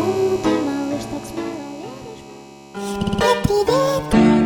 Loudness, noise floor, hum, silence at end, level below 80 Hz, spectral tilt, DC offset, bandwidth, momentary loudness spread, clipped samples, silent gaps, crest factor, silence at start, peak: -20 LUFS; -40 dBFS; none; 0 s; -38 dBFS; -6 dB/octave; under 0.1%; 19 kHz; 19 LU; under 0.1%; none; 18 dB; 0 s; -2 dBFS